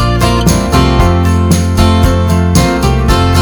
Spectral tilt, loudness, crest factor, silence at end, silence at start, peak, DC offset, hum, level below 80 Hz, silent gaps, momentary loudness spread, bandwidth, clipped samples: -5.5 dB/octave; -10 LUFS; 8 dB; 0 s; 0 s; 0 dBFS; under 0.1%; none; -16 dBFS; none; 2 LU; over 20 kHz; 1%